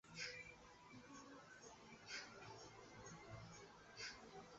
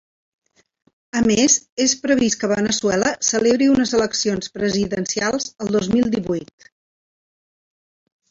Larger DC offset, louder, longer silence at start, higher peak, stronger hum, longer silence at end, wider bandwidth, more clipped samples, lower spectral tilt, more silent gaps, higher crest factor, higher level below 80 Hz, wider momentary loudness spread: neither; second, -57 LUFS vs -19 LUFS; second, 0.05 s vs 1.15 s; second, -36 dBFS vs -4 dBFS; neither; second, 0 s vs 1.85 s; about the same, 8 kHz vs 8 kHz; neither; second, -2 dB/octave vs -3.5 dB/octave; second, none vs 1.69-1.77 s; about the same, 22 dB vs 18 dB; second, -78 dBFS vs -52 dBFS; first, 10 LU vs 7 LU